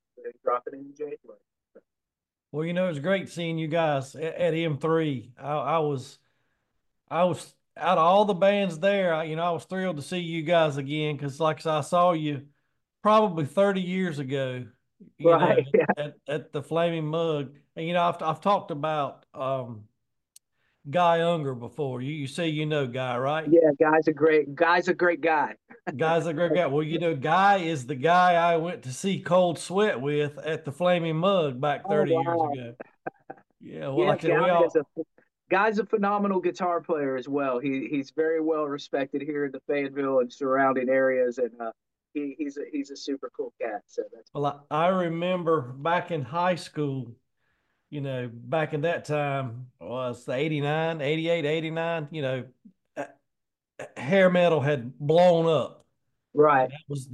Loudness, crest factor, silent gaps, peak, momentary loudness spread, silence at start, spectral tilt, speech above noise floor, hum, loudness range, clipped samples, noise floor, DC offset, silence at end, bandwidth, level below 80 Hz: -26 LUFS; 18 dB; none; -8 dBFS; 15 LU; 0.2 s; -6.5 dB/octave; 64 dB; none; 6 LU; under 0.1%; -89 dBFS; under 0.1%; 0 s; 12 kHz; -76 dBFS